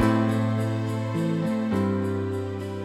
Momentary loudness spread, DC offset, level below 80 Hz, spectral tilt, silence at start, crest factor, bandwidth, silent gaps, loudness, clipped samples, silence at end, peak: 6 LU; under 0.1%; -54 dBFS; -8 dB/octave; 0 s; 16 dB; 13.5 kHz; none; -26 LUFS; under 0.1%; 0 s; -10 dBFS